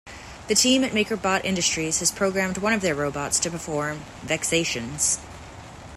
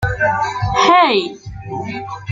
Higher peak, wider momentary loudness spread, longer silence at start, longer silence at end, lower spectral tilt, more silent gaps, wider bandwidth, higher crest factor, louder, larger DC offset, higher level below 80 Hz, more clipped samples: second, -6 dBFS vs 0 dBFS; about the same, 18 LU vs 16 LU; about the same, 0.05 s vs 0 s; about the same, 0 s vs 0 s; second, -2.5 dB/octave vs -5 dB/octave; neither; first, 16 kHz vs 7.8 kHz; about the same, 18 dB vs 16 dB; second, -23 LUFS vs -15 LUFS; neither; second, -50 dBFS vs -36 dBFS; neither